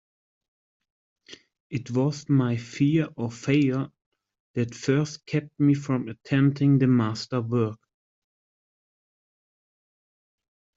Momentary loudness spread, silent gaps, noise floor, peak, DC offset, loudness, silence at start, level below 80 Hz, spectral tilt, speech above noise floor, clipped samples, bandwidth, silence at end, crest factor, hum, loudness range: 10 LU; 1.60-1.70 s, 4.06-4.12 s, 4.40-4.54 s; under -90 dBFS; -8 dBFS; under 0.1%; -25 LUFS; 1.3 s; -66 dBFS; -7.5 dB/octave; over 66 dB; under 0.1%; 7.8 kHz; 3 s; 18 dB; none; 6 LU